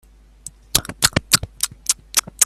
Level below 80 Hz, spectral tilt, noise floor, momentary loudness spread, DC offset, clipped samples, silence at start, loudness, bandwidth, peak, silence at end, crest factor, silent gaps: -40 dBFS; -1 dB/octave; -42 dBFS; 22 LU; under 0.1%; under 0.1%; 0.45 s; -19 LUFS; 17 kHz; 0 dBFS; 0 s; 22 dB; none